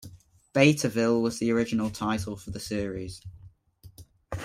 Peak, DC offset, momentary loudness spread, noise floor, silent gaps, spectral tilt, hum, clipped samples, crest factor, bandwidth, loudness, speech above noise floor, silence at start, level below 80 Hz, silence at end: -6 dBFS; under 0.1%; 18 LU; -54 dBFS; none; -5.5 dB/octave; none; under 0.1%; 22 dB; 16 kHz; -27 LUFS; 28 dB; 0 s; -54 dBFS; 0 s